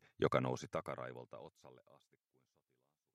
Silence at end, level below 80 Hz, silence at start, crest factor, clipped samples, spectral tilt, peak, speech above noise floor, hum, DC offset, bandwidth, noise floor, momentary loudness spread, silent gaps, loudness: 1.35 s; -76 dBFS; 0.2 s; 26 dB; under 0.1%; -6 dB/octave; -16 dBFS; 43 dB; none; under 0.1%; 14 kHz; -85 dBFS; 20 LU; none; -40 LUFS